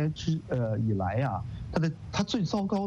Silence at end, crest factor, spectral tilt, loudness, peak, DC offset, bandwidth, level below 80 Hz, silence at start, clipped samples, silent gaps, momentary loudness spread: 0 s; 16 dB; -6.5 dB/octave; -30 LUFS; -12 dBFS; under 0.1%; 8 kHz; -48 dBFS; 0 s; under 0.1%; none; 4 LU